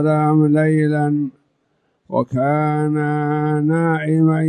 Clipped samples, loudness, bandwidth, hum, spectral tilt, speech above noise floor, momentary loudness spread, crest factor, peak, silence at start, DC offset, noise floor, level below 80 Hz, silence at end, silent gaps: under 0.1%; -18 LUFS; 9.8 kHz; none; -9.5 dB/octave; 49 dB; 7 LU; 12 dB; -6 dBFS; 0 s; under 0.1%; -66 dBFS; -60 dBFS; 0 s; none